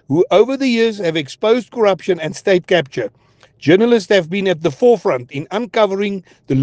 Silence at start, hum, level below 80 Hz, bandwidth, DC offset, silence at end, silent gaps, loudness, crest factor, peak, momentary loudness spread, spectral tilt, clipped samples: 0.1 s; none; -56 dBFS; 9.2 kHz; under 0.1%; 0 s; none; -16 LUFS; 16 dB; 0 dBFS; 10 LU; -6 dB/octave; under 0.1%